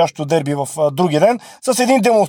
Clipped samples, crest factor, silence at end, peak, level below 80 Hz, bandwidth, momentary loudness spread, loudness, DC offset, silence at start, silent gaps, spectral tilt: under 0.1%; 14 dB; 0 s; 0 dBFS; -62 dBFS; over 20 kHz; 7 LU; -16 LUFS; under 0.1%; 0 s; none; -5 dB/octave